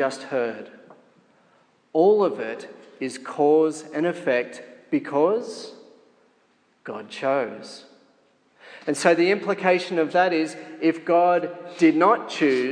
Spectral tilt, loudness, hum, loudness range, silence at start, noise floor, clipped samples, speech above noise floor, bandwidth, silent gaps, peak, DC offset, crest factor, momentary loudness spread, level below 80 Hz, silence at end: -5 dB/octave; -22 LUFS; none; 7 LU; 0 s; -63 dBFS; under 0.1%; 41 dB; 10.5 kHz; none; -2 dBFS; under 0.1%; 22 dB; 18 LU; -84 dBFS; 0 s